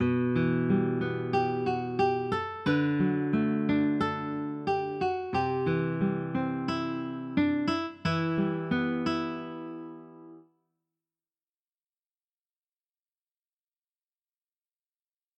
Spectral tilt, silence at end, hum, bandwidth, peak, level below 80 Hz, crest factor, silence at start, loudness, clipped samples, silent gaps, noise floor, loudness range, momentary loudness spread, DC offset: -8 dB/octave; 4.95 s; none; 8.2 kHz; -14 dBFS; -62 dBFS; 16 dB; 0 s; -29 LUFS; under 0.1%; none; under -90 dBFS; 8 LU; 7 LU; under 0.1%